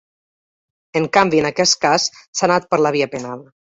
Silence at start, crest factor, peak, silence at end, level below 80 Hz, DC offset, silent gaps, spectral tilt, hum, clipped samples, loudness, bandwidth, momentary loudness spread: 0.95 s; 18 dB; -2 dBFS; 0.4 s; -58 dBFS; under 0.1%; 2.28-2.33 s; -3 dB/octave; none; under 0.1%; -17 LUFS; 7.8 kHz; 11 LU